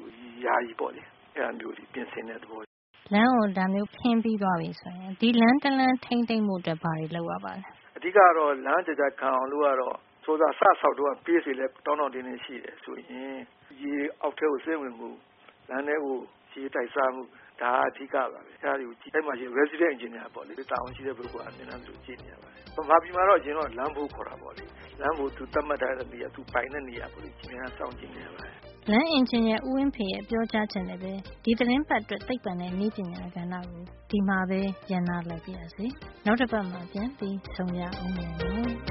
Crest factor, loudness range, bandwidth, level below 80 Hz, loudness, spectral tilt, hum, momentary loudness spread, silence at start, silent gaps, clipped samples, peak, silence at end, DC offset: 24 dB; 8 LU; 5.8 kHz; -52 dBFS; -28 LUFS; -4 dB/octave; none; 19 LU; 0 s; 2.67-2.94 s; under 0.1%; -4 dBFS; 0 s; under 0.1%